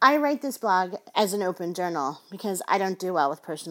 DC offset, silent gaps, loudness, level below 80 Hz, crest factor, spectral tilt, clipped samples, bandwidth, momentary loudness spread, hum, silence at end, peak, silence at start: under 0.1%; none; -26 LUFS; -86 dBFS; 22 dB; -4 dB/octave; under 0.1%; 17 kHz; 7 LU; none; 0 s; -4 dBFS; 0 s